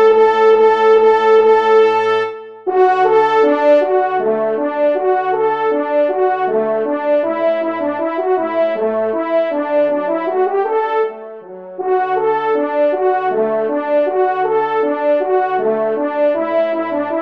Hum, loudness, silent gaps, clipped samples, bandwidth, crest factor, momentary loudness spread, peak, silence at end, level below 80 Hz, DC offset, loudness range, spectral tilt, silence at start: none; -15 LUFS; none; under 0.1%; 6.6 kHz; 12 dB; 8 LU; -2 dBFS; 0 s; -70 dBFS; 0.2%; 5 LU; -6 dB/octave; 0 s